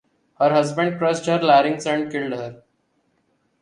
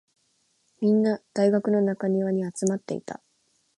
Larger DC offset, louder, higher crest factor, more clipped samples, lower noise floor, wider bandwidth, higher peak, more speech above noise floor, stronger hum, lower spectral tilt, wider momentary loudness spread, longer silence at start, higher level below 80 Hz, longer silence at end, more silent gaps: neither; first, -20 LUFS vs -25 LUFS; about the same, 18 dB vs 16 dB; neither; about the same, -67 dBFS vs -69 dBFS; about the same, 11 kHz vs 11.5 kHz; first, -4 dBFS vs -10 dBFS; about the same, 48 dB vs 45 dB; neither; second, -5.5 dB/octave vs -7 dB/octave; about the same, 12 LU vs 12 LU; second, 0.4 s vs 0.8 s; first, -68 dBFS vs -74 dBFS; first, 1.05 s vs 0.65 s; neither